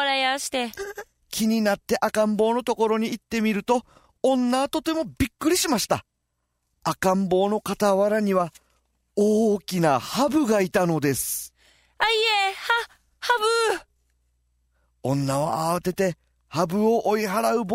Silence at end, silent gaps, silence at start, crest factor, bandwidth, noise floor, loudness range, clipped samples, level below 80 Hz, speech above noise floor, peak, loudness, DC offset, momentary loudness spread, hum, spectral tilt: 0 s; none; 0 s; 16 dB; 16 kHz; -76 dBFS; 3 LU; under 0.1%; -54 dBFS; 54 dB; -8 dBFS; -23 LUFS; under 0.1%; 9 LU; none; -4.5 dB/octave